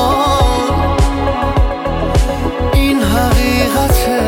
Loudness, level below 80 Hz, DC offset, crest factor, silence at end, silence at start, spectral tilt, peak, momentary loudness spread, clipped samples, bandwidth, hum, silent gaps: -14 LUFS; -18 dBFS; under 0.1%; 12 dB; 0 s; 0 s; -5.5 dB/octave; 0 dBFS; 4 LU; under 0.1%; 17 kHz; none; none